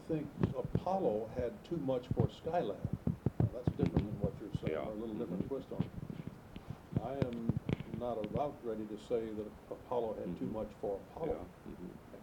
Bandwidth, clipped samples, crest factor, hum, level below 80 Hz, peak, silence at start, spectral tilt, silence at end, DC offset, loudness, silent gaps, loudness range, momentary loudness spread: 18.5 kHz; under 0.1%; 22 dB; none; -54 dBFS; -16 dBFS; 0 s; -9 dB/octave; 0 s; under 0.1%; -39 LUFS; none; 4 LU; 12 LU